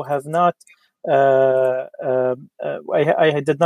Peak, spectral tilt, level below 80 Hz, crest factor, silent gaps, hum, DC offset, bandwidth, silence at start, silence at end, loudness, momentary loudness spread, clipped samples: -2 dBFS; -6.5 dB/octave; -70 dBFS; 16 dB; none; none; under 0.1%; 12 kHz; 0 s; 0 s; -19 LUFS; 12 LU; under 0.1%